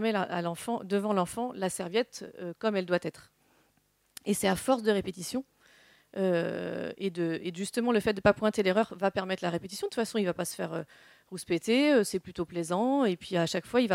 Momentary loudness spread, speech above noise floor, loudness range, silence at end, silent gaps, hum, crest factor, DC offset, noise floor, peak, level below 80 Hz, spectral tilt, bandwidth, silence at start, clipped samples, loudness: 11 LU; 41 dB; 4 LU; 0 s; none; none; 22 dB; under 0.1%; -71 dBFS; -8 dBFS; -64 dBFS; -5 dB/octave; 16.5 kHz; 0 s; under 0.1%; -30 LUFS